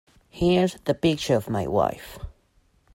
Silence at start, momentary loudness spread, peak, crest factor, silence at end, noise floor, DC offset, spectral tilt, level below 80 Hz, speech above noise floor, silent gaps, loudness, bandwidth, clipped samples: 0.35 s; 19 LU; -8 dBFS; 16 dB; 0.65 s; -63 dBFS; under 0.1%; -6 dB/octave; -46 dBFS; 40 dB; none; -24 LUFS; 16.5 kHz; under 0.1%